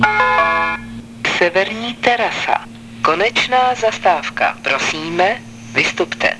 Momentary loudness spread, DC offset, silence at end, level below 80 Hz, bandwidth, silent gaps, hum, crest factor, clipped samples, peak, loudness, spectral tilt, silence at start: 7 LU; 0.2%; 0 s; -48 dBFS; 11 kHz; none; none; 16 dB; under 0.1%; 0 dBFS; -16 LUFS; -3 dB/octave; 0 s